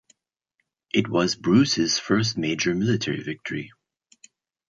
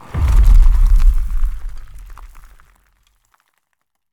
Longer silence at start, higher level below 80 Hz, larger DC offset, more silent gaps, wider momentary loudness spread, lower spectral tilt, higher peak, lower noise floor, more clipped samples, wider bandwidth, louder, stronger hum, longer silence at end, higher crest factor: first, 0.95 s vs 0.15 s; second, -58 dBFS vs -14 dBFS; neither; neither; second, 12 LU vs 26 LU; second, -4.5 dB/octave vs -6.5 dB/octave; second, -6 dBFS vs 0 dBFS; first, -77 dBFS vs -73 dBFS; neither; first, 7.8 kHz vs 4.3 kHz; second, -23 LUFS vs -17 LUFS; neither; second, 1.05 s vs 1.75 s; about the same, 18 dB vs 14 dB